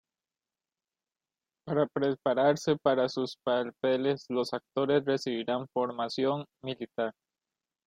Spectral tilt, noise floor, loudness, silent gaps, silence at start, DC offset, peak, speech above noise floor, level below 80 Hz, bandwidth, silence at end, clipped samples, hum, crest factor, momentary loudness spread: -6 dB/octave; under -90 dBFS; -30 LUFS; none; 1.65 s; under 0.1%; -12 dBFS; over 61 dB; -74 dBFS; 11.5 kHz; 0.75 s; under 0.1%; none; 20 dB; 9 LU